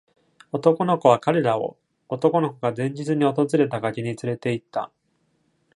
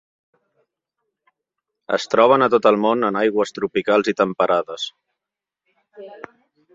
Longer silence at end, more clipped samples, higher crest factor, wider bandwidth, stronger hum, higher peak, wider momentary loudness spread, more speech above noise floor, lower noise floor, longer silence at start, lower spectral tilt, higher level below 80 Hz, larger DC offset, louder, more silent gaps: first, 0.9 s vs 0.6 s; neither; about the same, 20 dB vs 20 dB; first, 11.5 kHz vs 7.8 kHz; neither; about the same, -2 dBFS vs -2 dBFS; about the same, 13 LU vs 15 LU; second, 46 dB vs 68 dB; second, -68 dBFS vs -86 dBFS; second, 0.55 s vs 1.9 s; first, -7 dB/octave vs -5 dB/octave; about the same, -68 dBFS vs -64 dBFS; neither; second, -23 LUFS vs -18 LUFS; neither